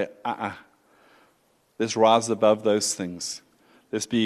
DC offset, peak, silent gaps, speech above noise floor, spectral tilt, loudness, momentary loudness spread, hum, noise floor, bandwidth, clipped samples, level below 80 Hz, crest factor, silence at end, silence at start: under 0.1%; -6 dBFS; none; 42 dB; -3.5 dB/octave; -24 LUFS; 14 LU; none; -65 dBFS; 13 kHz; under 0.1%; -70 dBFS; 18 dB; 0 s; 0 s